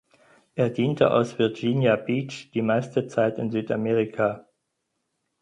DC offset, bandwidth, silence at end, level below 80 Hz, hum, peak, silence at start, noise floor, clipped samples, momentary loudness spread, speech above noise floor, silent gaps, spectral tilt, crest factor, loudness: under 0.1%; 10.5 kHz; 1 s; -66 dBFS; none; -6 dBFS; 0.55 s; -78 dBFS; under 0.1%; 7 LU; 54 dB; none; -7 dB/octave; 20 dB; -24 LUFS